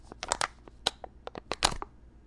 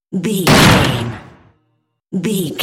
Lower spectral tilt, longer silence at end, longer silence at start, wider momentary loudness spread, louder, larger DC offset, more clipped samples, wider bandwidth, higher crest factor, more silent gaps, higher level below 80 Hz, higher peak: second, -1 dB/octave vs -4.5 dB/octave; about the same, 0.05 s vs 0 s; about the same, 0.05 s vs 0.1 s; about the same, 16 LU vs 17 LU; second, -32 LUFS vs -13 LUFS; neither; neither; second, 11.5 kHz vs 17.5 kHz; first, 28 dB vs 16 dB; neither; second, -48 dBFS vs -34 dBFS; second, -8 dBFS vs 0 dBFS